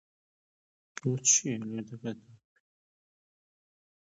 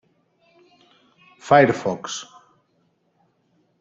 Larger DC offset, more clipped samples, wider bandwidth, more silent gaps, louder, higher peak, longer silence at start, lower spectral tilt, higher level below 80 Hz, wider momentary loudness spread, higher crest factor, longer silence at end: neither; neither; about the same, 8 kHz vs 8 kHz; neither; second, -28 LUFS vs -19 LUFS; second, -10 dBFS vs -2 dBFS; second, 0.95 s vs 1.45 s; second, -3 dB/octave vs -5 dB/octave; second, -76 dBFS vs -66 dBFS; second, 20 LU vs 26 LU; about the same, 26 dB vs 24 dB; first, 1.75 s vs 1.6 s